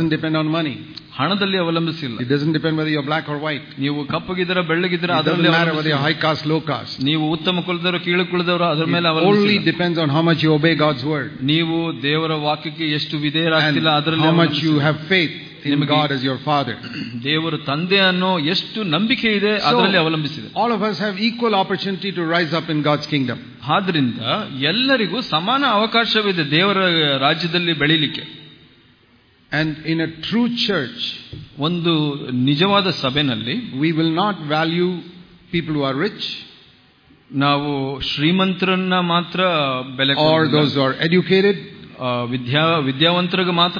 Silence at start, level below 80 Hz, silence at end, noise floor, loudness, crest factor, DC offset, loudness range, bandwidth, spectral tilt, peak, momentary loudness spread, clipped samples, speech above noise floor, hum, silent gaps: 0 s; -56 dBFS; 0 s; -54 dBFS; -18 LUFS; 18 dB; under 0.1%; 4 LU; 5.2 kHz; -7 dB/octave; -2 dBFS; 8 LU; under 0.1%; 35 dB; none; none